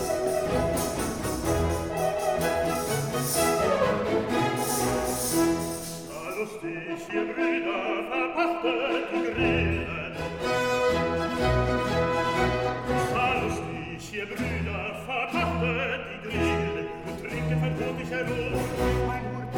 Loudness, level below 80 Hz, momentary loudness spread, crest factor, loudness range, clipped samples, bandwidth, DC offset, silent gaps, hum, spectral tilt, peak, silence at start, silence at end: -27 LUFS; -42 dBFS; 8 LU; 16 dB; 3 LU; under 0.1%; 19 kHz; under 0.1%; none; none; -5 dB/octave; -12 dBFS; 0 s; 0 s